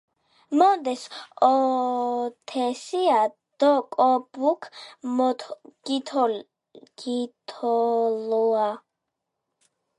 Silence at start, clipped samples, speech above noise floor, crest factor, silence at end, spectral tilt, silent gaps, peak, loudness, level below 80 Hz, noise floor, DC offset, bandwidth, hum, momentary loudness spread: 0.5 s; under 0.1%; 59 dB; 20 dB; 1.2 s; -4 dB/octave; none; -6 dBFS; -24 LUFS; -82 dBFS; -82 dBFS; under 0.1%; 11.5 kHz; none; 14 LU